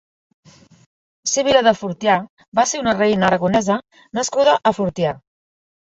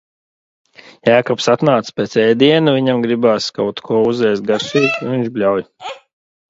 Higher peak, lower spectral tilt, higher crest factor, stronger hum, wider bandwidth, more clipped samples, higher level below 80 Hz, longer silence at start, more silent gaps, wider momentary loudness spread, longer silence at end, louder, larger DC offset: about the same, -2 dBFS vs 0 dBFS; second, -4 dB/octave vs -5.5 dB/octave; about the same, 18 dB vs 16 dB; neither; about the same, 8.2 kHz vs 7.8 kHz; neither; first, -54 dBFS vs -60 dBFS; first, 1.25 s vs 1.05 s; first, 2.30-2.37 s, 2.48-2.52 s vs none; about the same, 9 LU vs 8 LU; first, 0.7 s vs 0.5 s; second, -18 LUFS vs -15 LUFS; neither